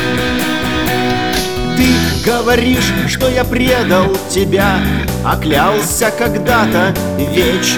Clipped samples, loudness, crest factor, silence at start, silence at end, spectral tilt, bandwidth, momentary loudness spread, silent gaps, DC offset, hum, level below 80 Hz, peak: under 0.1%; -13 LUFS; 12 dB; 0 s; 0 s; -4.5 dB/octave; over 20 kHz; 4 LU; none; 1%; none; -28 dBFS; -2 dBFS